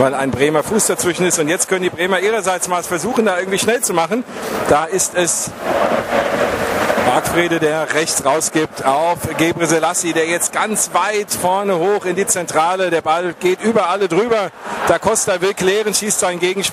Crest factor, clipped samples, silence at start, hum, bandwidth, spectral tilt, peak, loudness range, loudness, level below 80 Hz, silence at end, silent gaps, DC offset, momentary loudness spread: 16 dB; under 0.1%; 0 s; none; 16 kHz; -3 dB/octave; 0 dBFS; 1 LU; -16 LUFS; -50 dBFS; 0 s; none; under 0.1%; 3 LU